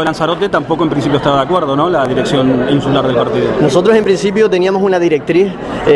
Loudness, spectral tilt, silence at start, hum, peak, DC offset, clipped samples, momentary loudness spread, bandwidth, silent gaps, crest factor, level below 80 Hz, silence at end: -12 LUFS; -6.5 dB/octave; 0 s; none; 0 dBFS; under 0.1%; under 0.1%; 4 LU; 11.5 kHz; none; 12 dB; -40 dBFS; 0 s